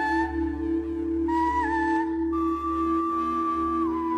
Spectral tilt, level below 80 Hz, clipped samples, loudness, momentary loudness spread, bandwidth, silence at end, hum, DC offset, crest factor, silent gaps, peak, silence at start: -7.5 dB/octave; -42 dBFS; under 0.1%; -26 LUFS; 4 LU; 8.4 kHz; 0 s; none; under 0.1%; 10 dB; none; -14 dBFS; 0 s